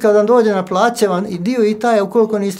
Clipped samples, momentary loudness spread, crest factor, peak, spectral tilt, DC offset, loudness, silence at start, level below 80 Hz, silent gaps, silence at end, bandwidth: under 0.1%; 5 LU; 14 dB; 0 dBFS; -5.5 dB/octave; under 0.1%; -14 LUFS; 0 s; -60 dBFS; none; 0 s; 16 kHz